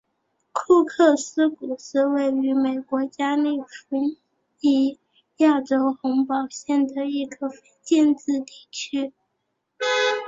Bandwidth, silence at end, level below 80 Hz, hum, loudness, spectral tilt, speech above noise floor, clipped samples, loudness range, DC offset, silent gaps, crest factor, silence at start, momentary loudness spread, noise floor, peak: 7.8 kHz; 0 s; -70 dBFS; none; -23 LUFS; -3 dB/octave; 54 dB; under 0.1%; 3 LU; under 0.1%; none; 18 dB; 0.55 s; 12 LU; -76 dBFS; -6 dBFS